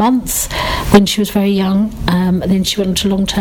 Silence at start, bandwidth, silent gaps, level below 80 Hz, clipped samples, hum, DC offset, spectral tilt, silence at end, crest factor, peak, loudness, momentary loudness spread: 0 s; 19.5 kHz; none; -28 dBFS; 0.2%; none; under 0.1%; -5 dB/octave; 0 s; 14 dB; 0 dBFS; -14 LUFS; 5 LU